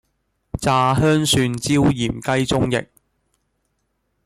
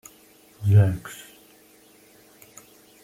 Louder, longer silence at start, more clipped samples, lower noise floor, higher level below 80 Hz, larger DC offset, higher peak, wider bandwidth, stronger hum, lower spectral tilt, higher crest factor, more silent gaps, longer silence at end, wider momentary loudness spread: first, -18 LUFS vs -21 LUFS; about the same, 0.55 s vs 0.6 s; neither; first, -71 dBFS vs -54 dBFS; first, -42 dBFS vs -56 dBFS; neither; about the same, -6 dBFS vs -6 dBFS; about the same, 16 kHz vs 15.5 kHz; neither; second, -5 dB/octave vs -7 dB/octave; about the same, 16 dB vs 20 dB; neither; second, 1.4 s vs 1.9 s; second, 7 LU vs 28 LU